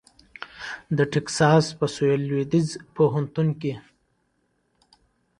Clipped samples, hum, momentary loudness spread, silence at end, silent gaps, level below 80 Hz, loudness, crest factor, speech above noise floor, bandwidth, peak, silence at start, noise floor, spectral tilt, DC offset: under 0.1%; none; 17 LU; 1.6 s; none; -60 dBFS; -23 LUFS; 20 dB; 48 dB; 11 kHz; -4 dBFS; 0.4 s; -70 dBFS; -6 dB/octave; under 0.1%